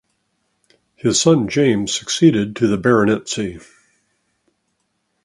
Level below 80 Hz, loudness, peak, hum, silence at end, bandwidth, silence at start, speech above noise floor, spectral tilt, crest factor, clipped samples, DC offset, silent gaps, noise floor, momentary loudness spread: -52 dBFS; -17 LUFS; 0 dBFS; none; 1.65 s; 11.5 kHz; 1.05 s; 54 dB; -4.5 dB/octave; 18 dB; under 0.1%; under 0.1%; none; -70 dBFS; 9 LU